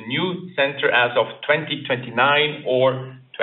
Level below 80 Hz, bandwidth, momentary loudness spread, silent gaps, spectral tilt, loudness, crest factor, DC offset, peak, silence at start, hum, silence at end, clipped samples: -68 dBFS; 4.2 kHz; 7 LU; none; -2 dB/octave; -20 LUFS; 18 dB; under 0.1%; -2 dBFS; 0 s; none; 0 s; under 0.1%